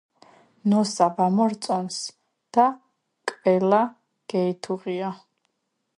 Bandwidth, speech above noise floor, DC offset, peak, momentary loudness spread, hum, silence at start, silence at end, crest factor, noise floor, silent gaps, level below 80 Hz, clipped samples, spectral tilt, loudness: 11.5 kHz; 55 dB; under 0.1%; -6 dBFS; 13 LU; none; 0.65 s; 0.8 s; 20 dB; -77 dBFS; none; -76 dBFS; under 0.1%; -5.5 dB/octave; -24 LUFS